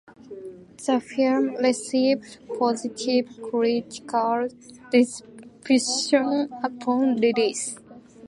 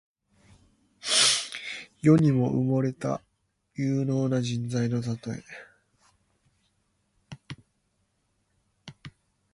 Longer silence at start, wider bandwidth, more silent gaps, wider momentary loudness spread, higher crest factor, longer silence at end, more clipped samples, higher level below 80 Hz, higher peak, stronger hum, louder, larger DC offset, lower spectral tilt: second, 0.25 s vs 1.05 s; about the same, 11.5 kHz vs 11.5 kHz; neither; second, 16 LU vs 25 LU; about the same, 18 dB vs 22 dB; second, 0 s vs 0.45 s; neither; second, -70 dBFS vs -62 dBFS; about the same, -6 dBFS vs -8 dBFS; neither; about the same, -24 LUFS vs -26 LUFS; neither; second, -3 dB/octave vs -4.5 dB/octave